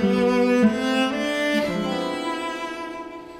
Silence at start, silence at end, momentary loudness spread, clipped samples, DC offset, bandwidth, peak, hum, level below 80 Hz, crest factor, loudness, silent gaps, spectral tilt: 0 s; 0 s; 12 LU; under 0.1%; under 0.1%; 15.5 kHz; -6 dBFS; none; -54 dBFS; 16 dB; -22 LUFS; none; -5.5 dB/octave